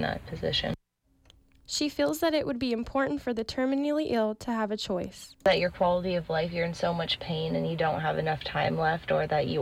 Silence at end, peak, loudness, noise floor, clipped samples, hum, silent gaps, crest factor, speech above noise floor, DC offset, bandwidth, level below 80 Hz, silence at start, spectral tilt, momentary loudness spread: 0 s; -14 dBFS; -29 LUFS; -67 dBFS; under 0.1%; none; none; 14 dB; 39 dB; under 0.1%; 16 kHz; -52 dBFS; 0 s; -5 dB/octave; 6 LU